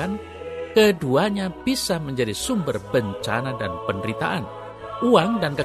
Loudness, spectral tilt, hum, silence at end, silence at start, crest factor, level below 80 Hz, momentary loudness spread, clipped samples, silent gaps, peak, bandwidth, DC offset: -22 LUFS; -5 dB/octave; none; 0 s; 0 s; 20 dB; -50 dBFS; 13 LU; under 0.1%; none; -2 dBFS; 13.5 kHz; under 0.1%